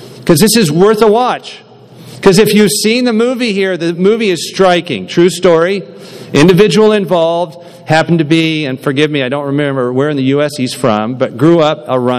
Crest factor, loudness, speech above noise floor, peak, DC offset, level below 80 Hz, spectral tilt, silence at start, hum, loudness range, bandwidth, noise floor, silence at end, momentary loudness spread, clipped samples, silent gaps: 10 dB; -10 LUFS; 24 dB; 0 dBFS; under 0.1%; -46 dBFS; -5 dB/octave; 0 s; none; 3 LU; 15.5 kHz; -34 dBFS; 0 s; 8 LU; 0.7%; none